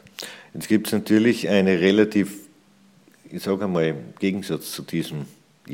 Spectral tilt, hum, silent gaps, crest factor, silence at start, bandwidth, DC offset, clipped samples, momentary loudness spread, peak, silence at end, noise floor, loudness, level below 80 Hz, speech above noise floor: -5.5 dB/octave; none; none; 20 dB; 0.2 s; 17 kHz; under 0.1%; under 0.1%; 18 LU; -4 dBFS; 0 s; -55 dBFS; -22 LUFS; -64 dBFS; 34 dB